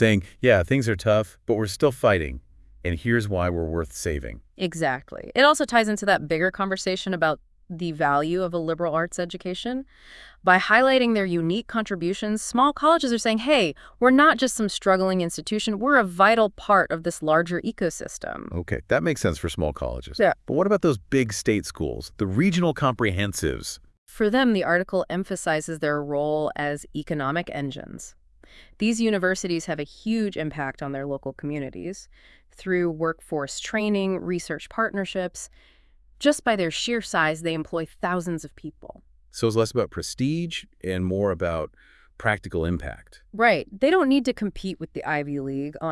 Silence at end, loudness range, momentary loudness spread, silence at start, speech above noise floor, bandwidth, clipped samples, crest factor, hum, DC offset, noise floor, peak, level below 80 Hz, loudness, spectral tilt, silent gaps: 0 s; 7 LU; 12 LU; 0 s; 29 dB; 12 kHz; under 0.1%; 20 dB; none; under 0.1%; -53 dBFS; -4 dBFS; -48 dBFS; -24 LUFS; -5 dB/octave; 23.98-24.06 s